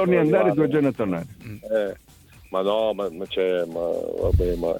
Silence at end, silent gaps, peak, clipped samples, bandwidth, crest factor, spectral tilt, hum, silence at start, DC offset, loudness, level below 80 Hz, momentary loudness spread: 0 s; none; -6 dBFS; under 0.1%; 18 kHz; 18 dB; -8 dB/octave; none; 0 s; under 0.1%; -23 LUFS; -38 dBFS; 12 LU